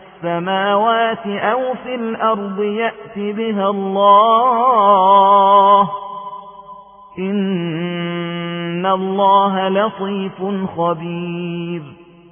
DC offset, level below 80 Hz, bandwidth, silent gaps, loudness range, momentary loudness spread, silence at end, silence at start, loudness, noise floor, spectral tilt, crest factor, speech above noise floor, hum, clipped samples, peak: under 0.1%; -62 dBFS; 3.6 kHz; none; 7 LU; 14 LU; 0.35 s; 0.2 s; -16 LUFS; -39 dBFS; -10 dB/octave; 16 dB; 23 dB; none; under 0.1%; 0 dBFS